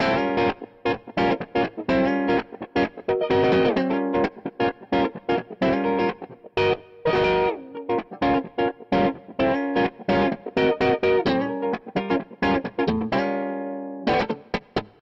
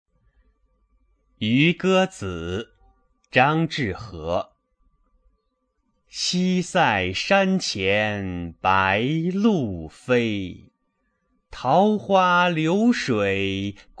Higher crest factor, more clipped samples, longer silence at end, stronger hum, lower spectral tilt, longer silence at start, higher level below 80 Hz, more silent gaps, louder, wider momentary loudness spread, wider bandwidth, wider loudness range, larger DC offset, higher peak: second, 14 dB vs 22 dB; neither; about the same, 0.15 s vs 0.25 s; neither; first, -7.5 dB/octave vs -5.5 dB/octave; second, 0 s vs 1.4 s; about the same, -50 dBFS vs -54 dBFS; neither; about the same, -24 LUFS vs -22 LUFS; second, 7 LU vs 12 LU; second, 7.6 kHz vs 10 kHz; second, 2 LU vs 5 LU; neither; second, -10 dBFS vs -2 dBFS